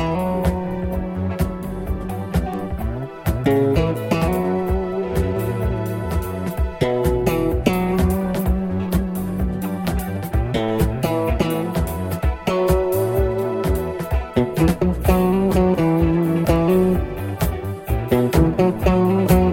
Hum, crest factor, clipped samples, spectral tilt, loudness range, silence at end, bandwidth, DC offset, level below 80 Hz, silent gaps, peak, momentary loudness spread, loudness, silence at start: none; 18 dB; under 0.1%; -7.5 dB/octave; 4 LU; 0 s; 17 kHz; under 0.1%; -28 dBFS; none; -2 dBFS; 8 LU; -20 LUFS; 0 s